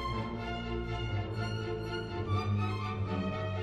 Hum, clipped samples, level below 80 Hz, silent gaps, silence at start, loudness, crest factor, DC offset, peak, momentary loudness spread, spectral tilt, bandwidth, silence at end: none; under 0.1%; -46 dBFS; none; 0 s; -35 LUFS; 12 dB; under 0.1%; -22 dBFS; 4 LU; -7 dB/octave; 9 kHz; 0 s